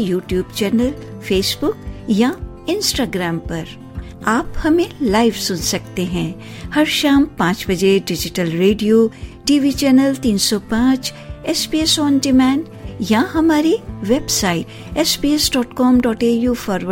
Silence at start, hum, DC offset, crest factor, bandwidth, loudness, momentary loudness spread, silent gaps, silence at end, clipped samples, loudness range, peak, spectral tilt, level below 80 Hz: 0 s; none; under 0.1%; 14 dB; 16.5 kHz; -17 LUFS; 10 LU; none; 0 s; under 0.1%; 4 LU; -2 dBFS; -4 dB/octave; -36 dBFS